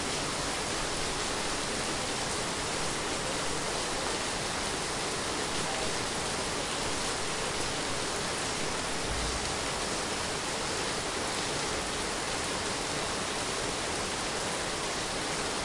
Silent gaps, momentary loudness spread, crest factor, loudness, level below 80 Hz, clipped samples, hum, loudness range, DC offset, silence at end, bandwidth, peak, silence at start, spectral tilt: none; 1 LU; 14 dB; -31 LUFS; -48 dBFS; under 0.1%; none; 0 LU; under 0.1%; 0 s; 11.5 kHz; -18 dBFS; 0 s; -2 dB/octave